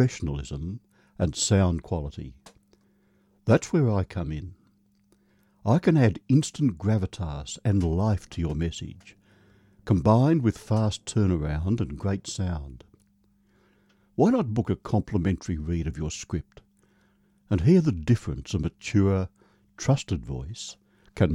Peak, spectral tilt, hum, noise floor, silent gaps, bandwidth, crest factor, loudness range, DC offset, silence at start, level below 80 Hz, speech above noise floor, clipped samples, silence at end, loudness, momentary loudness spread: -8 dBFS; -6.5 dB/octave; none; -64 dBFS; none; 11.5 kHz; 18 dB; 4 LU; under 0.1%; 0 s; -42 dBFS; 40 dB; under 0.1%; 0 s; -26 LUFS; 15 LU